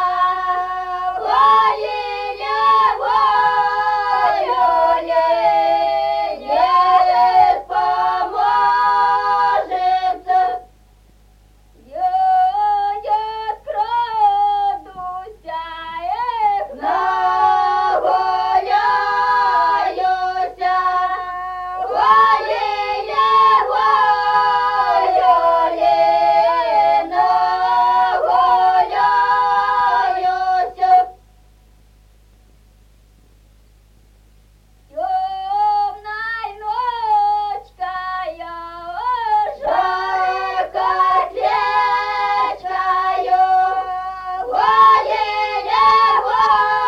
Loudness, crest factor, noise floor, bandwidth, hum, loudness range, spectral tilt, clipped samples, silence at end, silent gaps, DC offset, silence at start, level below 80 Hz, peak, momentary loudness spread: -16 LUFS; 14 dB; -50 dBFS; 8 kHz; none; 6 LU; -3.5 dB/octave; under 0.1%; 0 s; none; under 0.1%; 0 s; -50 dBFS; -2 dBFS; 11 LU